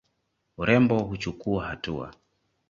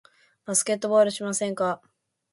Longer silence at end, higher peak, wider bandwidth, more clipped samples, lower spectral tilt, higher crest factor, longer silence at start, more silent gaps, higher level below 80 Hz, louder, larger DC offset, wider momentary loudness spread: about the same, 0.6 s vs 0.55 s; first, -6 dBFS vs -10 dBFS; second, 7.4 kHz vs 12 kHz; neither; first, -7 dB/octave vs -3 dB/octave; about the same, 22 dB vs 18 dB; about the same, 0.6 s vs 0.5 s; neither; first, -50 dBFS vs -74 dBFS; about the same, -26 LUFS vs -24 LUFS; neither; first, 13 LU vs 10 LU